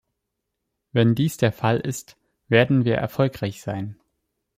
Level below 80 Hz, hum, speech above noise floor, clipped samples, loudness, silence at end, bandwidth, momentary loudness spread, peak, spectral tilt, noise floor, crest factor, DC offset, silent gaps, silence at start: -58 dBFS; none; 59 dB; under 0.1%; -22 LUFS; 0.65 s; 16 kHz; 12 LU; -4 dBFS; -6.5 dB/octave; -80 dBFS; 20 dB; under 0.1%; none; 0.95 s